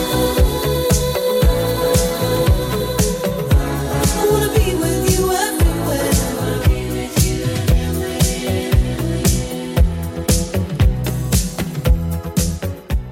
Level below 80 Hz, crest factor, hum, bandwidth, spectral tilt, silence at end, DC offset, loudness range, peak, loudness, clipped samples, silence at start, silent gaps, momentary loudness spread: -22 dBFS; 14 dB; none; 17 kHz; -5 dB/octave; 0 s; under 0.1%; 2 LU; -2 dBFS; -18 LUFS; under 0.1%; 0 s; none; 5 LU